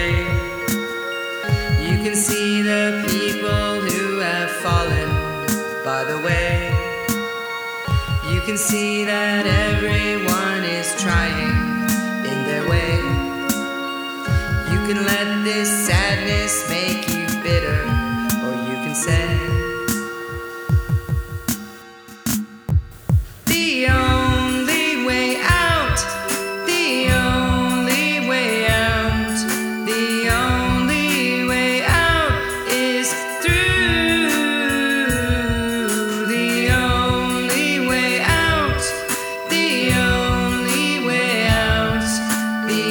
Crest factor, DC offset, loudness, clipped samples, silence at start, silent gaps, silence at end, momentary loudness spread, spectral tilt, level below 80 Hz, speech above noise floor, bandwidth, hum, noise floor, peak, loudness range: 18 dB; under 0.1%; -19 LUFS; under 0.1%; 0 s; none; 0 s; 6 LU; -4 dB/octave; -30 dBFS; 21 dB; over 20 kHz; none; -40 dBFS; -2 dBFS; 4 LU